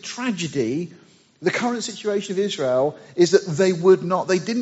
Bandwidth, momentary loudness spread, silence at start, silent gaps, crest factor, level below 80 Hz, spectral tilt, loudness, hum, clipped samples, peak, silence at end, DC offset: 8 kHz; 9 LU; 0.05 s; none; 18 dB; -68 dBFS; -4.5 dB/octave; -21 LUFS; none; under 0.1%; -2 dBFS; 0 s; under 0.1%